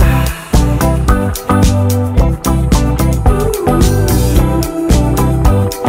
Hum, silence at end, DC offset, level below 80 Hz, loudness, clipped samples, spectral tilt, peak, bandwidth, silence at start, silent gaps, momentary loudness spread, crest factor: none; 0 s; under 0.1%; -14 dBFS; -12 LUFS; under 0.1%; -6 dB/octave; 0 dBFS; 16.5 kHz; 0 s; none; 3 LU; 10 dB